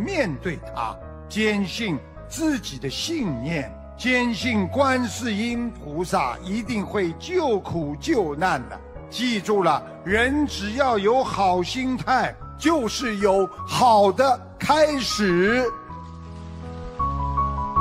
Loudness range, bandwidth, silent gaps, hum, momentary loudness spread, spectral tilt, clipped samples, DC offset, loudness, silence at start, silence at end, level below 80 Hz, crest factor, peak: 5 LU; 16 kHz; none; none; 12 LU; -5 dB/octave; under 0.1%; under 0.1%; -23 LUFS; 0 s; 0 s; -40 dBFS; 18 dB; -4 dBFS